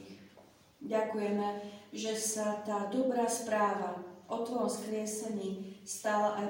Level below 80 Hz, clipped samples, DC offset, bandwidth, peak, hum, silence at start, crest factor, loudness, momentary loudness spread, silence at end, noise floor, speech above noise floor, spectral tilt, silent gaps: -80 dBFS; under 0.1%; under 0.1%; 16.5 kHz; -20 dBFS; none; 0 s; 16 dB; -35 LUFS; 12 LU; 0 s; -60 dBFS; 26 dB; -4 dB/octave; none